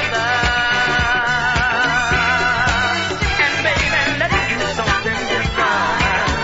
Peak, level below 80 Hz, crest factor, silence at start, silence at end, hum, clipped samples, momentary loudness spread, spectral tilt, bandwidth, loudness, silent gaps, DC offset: -4 dBFS; -30 dBFS; 14 dB; 0 s; 0 s; none; under 0.1%; 3 LU; -3.5 dB/octave; 8 kHz; -16 LUFS; none; under 0.1%